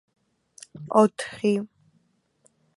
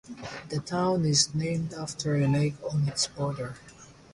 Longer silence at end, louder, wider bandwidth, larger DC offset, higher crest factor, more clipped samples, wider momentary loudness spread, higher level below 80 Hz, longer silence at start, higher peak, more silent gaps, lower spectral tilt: first, 1.1 s vs 0.2 s; first, -24 LUFS vs -28 LUFS; about the same, 11.5 kHz vs 11.5 kHz; neither; about the same, 24 dB vs 20 dB; neither; first, 22 LU vs 14 LU; second, -72 dBFS vs -58 dBFS; first, 0.75 s vs 0.05 s; first, -4 dBFS vs -8 dBFS; neither; first, -6 dB/octave vs -4.5 dB/octave